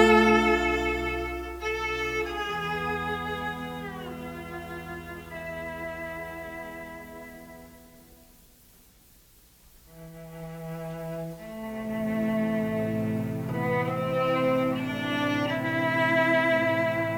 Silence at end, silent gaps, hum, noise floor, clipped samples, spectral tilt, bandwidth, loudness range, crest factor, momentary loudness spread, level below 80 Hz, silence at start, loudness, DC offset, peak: 0 s; none; none; -57 dBFS; under 0.1%; -6 dB/octave; 20 kHz; 19 LU; 22 dB; 17 LU; -48 dBFS; 0 s; -28 LUFS; under 0.1%; -6 dBFS